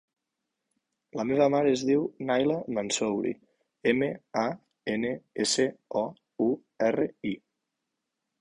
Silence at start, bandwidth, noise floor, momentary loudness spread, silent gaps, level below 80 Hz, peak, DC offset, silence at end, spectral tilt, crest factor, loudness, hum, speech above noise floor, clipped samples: 1.15 s; 11.5 kHz; -84 dBFS; 11 LU; none; -68 dBFS; -10 dBFS; under 0.1%; 1.05 s; -4 dB/octave; 18 dB; -28 LUFS; none; 57 dB; under 0.1%